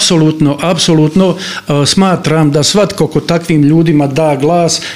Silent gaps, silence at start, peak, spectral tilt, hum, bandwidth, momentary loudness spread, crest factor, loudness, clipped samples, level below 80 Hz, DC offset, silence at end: none; 0 s; 0 dBFS; -5 dB/octave; none; 15.5 kHz; 4 LU; 10 dB; -10 LUFS; under 0.1%; -40 dBFS; 0.5%; 0 s